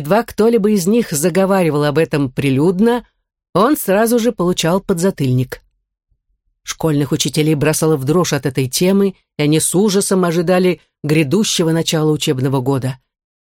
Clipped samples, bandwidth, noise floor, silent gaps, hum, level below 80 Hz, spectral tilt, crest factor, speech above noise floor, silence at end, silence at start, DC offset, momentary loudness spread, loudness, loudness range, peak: under 0.1%; 17 kHz; -66 dBFS; 3.49-3.53 s; none; -48 dBFS; -5 dB/octave; 14 dB; 52 dB; 0.6 s; 0 s; under 0.1%; 6 LU; -15 LUFS; 3 LU; -2 dBFS